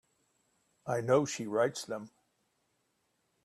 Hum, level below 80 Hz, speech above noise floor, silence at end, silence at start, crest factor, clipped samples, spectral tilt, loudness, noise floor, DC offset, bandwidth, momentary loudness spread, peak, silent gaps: none; -78 dBFS; 47 dB; 1.4 s; 0.85 s; 22 dB; under 0.1%; -5 dB/octave; -32 LUFS; -78 dBFS; under 0.1%; 13.5 kHz; 13 LU; -14 dBFS; none